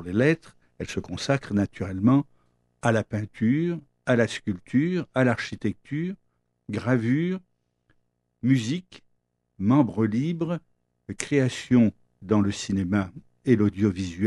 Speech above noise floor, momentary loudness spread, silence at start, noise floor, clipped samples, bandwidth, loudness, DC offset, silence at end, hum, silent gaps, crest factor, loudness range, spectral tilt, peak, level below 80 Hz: 49 dB; 12 LU; 0 s; -73 dBFS; under 0.1%; 11.5 kHz; -25 LUFS; under 0.1%; 0 s; none; none; 20 dB; 4 LU; -6.5 dB/octave; -6 dBFS; -58 dBFS